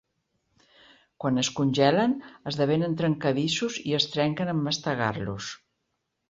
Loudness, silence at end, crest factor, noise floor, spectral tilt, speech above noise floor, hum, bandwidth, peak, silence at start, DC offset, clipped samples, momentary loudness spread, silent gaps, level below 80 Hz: -26 LUFS; 0.75 s; 20 dB; -79 dBFS; -5 dB/octave; 53 dB; none; 8 kHz; -8 dBFS; 1.2 s; under 0.1%; under 0.1%; 11 LU; none; -62 dBFS